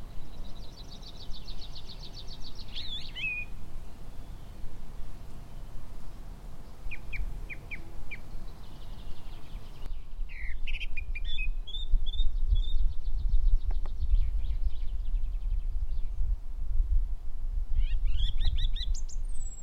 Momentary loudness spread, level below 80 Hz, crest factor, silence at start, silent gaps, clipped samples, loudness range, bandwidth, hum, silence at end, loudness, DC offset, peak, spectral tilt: 15 LU; -30 dBFS; 16 dB; 0 s; none; under 0.1%; 10 LU; 8.2 kHz; none; 0 s; -37 LUFS; under 0.1%; -12 dBFS; -4 dB/octave